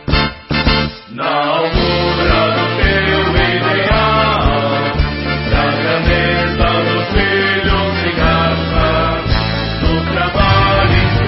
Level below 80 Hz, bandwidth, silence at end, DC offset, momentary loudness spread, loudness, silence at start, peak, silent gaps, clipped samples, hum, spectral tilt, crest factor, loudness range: -22 dBFS; 5.8 kHz; 0 s; under 0.1%; 4 LU; -14 LUFS; 0 s; 0 dBFS; none; under 0.1%; none; -10 dB/octave; 12 dB; 1 LU